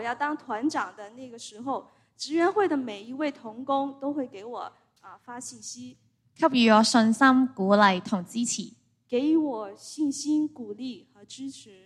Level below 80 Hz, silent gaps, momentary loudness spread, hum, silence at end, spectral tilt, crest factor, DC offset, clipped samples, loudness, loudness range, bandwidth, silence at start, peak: -74 dBFS; none; 20 LU; none; 0.15 s; -4 dB/octave; 22 dB; under 0.1%; under 0.1%; -25 LUFS; 9 LU; 12.5 kHz; 0 s; -6 dBFS